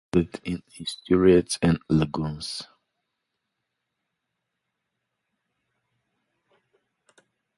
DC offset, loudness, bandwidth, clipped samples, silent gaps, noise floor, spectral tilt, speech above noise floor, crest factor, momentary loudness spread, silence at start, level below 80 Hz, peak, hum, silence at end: under 0.1%; -24 LUFS; 11.5 kHz; under 0.1%; none; -81 dBFS; -6 dB/octave; 58 dB; 22 dB; 16 LU; 0.15 s; -48 dBFS; -6 dBFS; none; 4.95 s